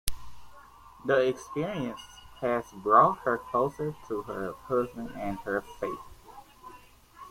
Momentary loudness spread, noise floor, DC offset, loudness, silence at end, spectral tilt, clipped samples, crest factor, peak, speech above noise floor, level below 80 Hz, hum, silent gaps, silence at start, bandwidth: 25 LU; -53 dBFS; under 0.1%; -29 LUFS; 0 s; -5.5 dB/octave; under 0.1%; 26 dB; -4 dBFS; 24 dB; -52 dBFS; none; none; 0.05 s; 16.5 kHz